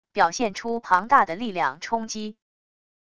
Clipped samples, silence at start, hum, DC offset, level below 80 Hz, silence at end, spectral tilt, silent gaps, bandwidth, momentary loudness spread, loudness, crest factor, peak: under 0.1%; 0.05 s; none; 0.4%; -60 dBFS; 0.65 s; -3.5 dB/octave; none; 11 kHz; 13 LU; -23 LUFS; 22 dB; -4 dBFS